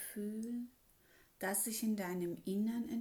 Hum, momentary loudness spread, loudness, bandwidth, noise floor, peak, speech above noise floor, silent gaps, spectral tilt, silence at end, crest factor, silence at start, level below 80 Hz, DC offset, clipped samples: none; 8 LU; -39 LUFS; over 20 kHz; -68 dBFS; -24 dBFS; 29 dB; none; -4.5 dB/octave; 0 s; 16 dB; 0 s; -76 dBFS; under 0.1%; under 0.1%